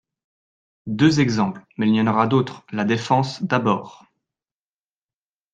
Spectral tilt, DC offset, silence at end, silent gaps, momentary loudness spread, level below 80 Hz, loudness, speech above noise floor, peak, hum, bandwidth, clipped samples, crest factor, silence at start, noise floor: -6.5 dB/octave; under 0.1%; 1.6 s; none; 8 LU; -60 dBFS; -20 LUFS; over 70 dB; -4 dBFS; none; 9 kHz; under 0.1%; 20 dB; 0.85 s; under -90 dBFS